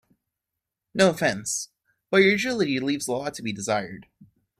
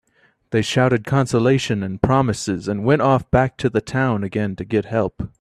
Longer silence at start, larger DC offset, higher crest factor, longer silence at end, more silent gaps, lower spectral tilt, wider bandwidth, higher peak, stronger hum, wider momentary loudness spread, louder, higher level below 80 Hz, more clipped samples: first, 0.95 s vs 0.5 s; neither; about the same, 20 dB vs 18 dB; first, 0.35 s vs 0.15 s; neither; second, -4 dB/octave vs -6.5 dB/octave; first, 15 kHz vs 12 kHz; second, -6 dBFS vs 0 dBFS; neither; first, 14 LU vs 7 LU; second, -24 LUFS vs -19 LUFS; second, -64 dBFS vs -42 dBFS; neither